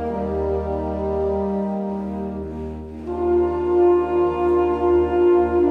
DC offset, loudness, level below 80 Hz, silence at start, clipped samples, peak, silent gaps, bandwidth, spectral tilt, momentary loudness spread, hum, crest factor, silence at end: under 0.1%; -21 LUFS; -36 dBFS; 0 s; under 0.1%; -8 dBFS; none; 3.8 kHz; -10 dB/octave; 13 LU; none; 12 dB; 0 s